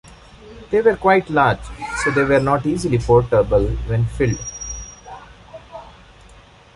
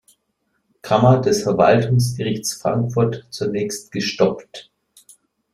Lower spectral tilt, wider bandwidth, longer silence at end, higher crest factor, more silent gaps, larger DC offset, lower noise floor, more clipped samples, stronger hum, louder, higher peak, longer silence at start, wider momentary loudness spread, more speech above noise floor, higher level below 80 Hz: about the same, -6 dB/octave vs -5.5 dB/octave; second, 11.5 kHz vs 14.5 kHz; about the same, 0.85 s vs 0.95 s; about the same, 18 dB vs 20 dB; neither; neither; second, -46 dBFS vs -70 dBFS; neither; neither; about the same, -18 LUFS vs -19 LUFS; about the same, -2 dBFS vs 0 dBFS; second, 0.05 s vs 0.85 s; first, 23 LU vs 11 LU; second, 29 dB vs 52 dB; first, -34 dBFS vs -54 dBFS